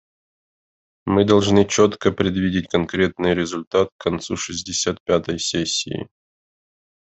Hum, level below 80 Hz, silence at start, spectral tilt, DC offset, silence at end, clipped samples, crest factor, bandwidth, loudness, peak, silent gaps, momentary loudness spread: none; -56 dBFS; 1.05 s; -4.5 dB/octave; under 0.1%; 1 s; under 0.1%; 20 dB; 8.4 kHz; -20 LUFS; -2 dBFS; 3.67-3.71 s, 3.92-3.99 s, 5.00-5.06 s; 10 LU